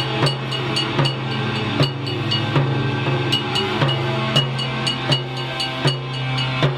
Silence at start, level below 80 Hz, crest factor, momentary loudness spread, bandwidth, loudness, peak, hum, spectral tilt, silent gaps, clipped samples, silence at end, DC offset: 0 s; -48 dBFS; 18 dB; 4 LU; 12.5 kHz; -20 LUFS; -4 dBFS; none; -5.5 dB/octave; none; under 0.1%; 0 s; under 0.1%